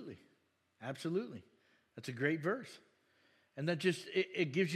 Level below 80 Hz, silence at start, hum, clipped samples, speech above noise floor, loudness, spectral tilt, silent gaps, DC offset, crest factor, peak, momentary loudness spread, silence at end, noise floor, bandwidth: under -90 dBFS; 0 s; none; under 0.1%; 39 dB; -38 LUFS; -5.5 dB/octave; none; under 0.1%; 20 dB; -20 dBFS; 20 LU; 0 s; -76 dBFS; 13 kHz